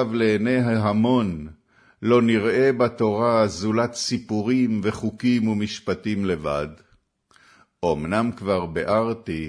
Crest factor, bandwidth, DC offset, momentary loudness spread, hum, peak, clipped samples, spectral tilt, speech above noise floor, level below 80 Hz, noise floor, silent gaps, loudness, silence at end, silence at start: 16 dB; 10.5 kHz; under 0.1%; 8 LU; none; -6 dBFS; under 0.1%; -6 dB/octave; 40 dB; -52 dBFS; -61 dBFS; none; -22 LUFS; 0 s; 0 s